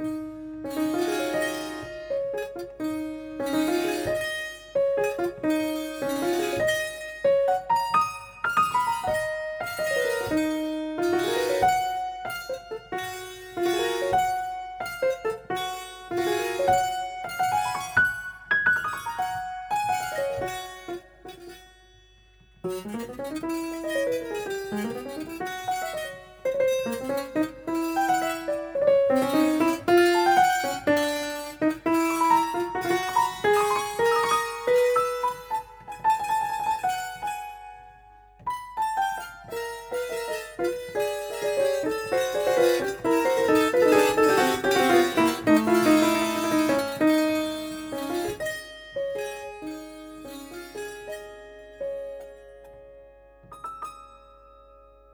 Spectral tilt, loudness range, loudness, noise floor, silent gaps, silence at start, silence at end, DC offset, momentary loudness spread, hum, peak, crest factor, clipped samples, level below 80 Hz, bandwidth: -4 dB/octave; 12 LU; -26 LUFS; -56 dBFS; none; 0 s; 0.95 s; under 0.1%; 16 LU; none; -8 dBFS; 18 dB; under 0.1%; -56 dBFS; over 20 kHz